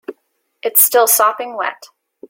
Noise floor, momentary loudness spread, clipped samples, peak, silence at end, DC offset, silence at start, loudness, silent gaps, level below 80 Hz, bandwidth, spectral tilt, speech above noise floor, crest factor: -66 dBFS; 15 LU; under 0.1%; 0 dBFS; 0.45 s; under 0.1%; 0.1 s; -13 LUFS; none; -70 dBFS; over 20 kHz; 1 dB/octave; 52 dB; 16 dB